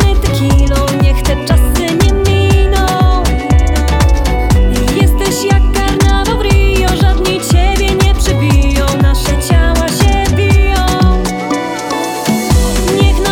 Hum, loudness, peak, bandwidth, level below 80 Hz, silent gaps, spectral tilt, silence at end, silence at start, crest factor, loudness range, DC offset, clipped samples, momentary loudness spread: none; -11 LUFS; 0 dBFS; 17 kHz; -12 dBFS; none; -5.5 dB/octave; 0 s; 0 s; 10 dB; 1 LU; under 0.1%; under 0.1%; 3 LU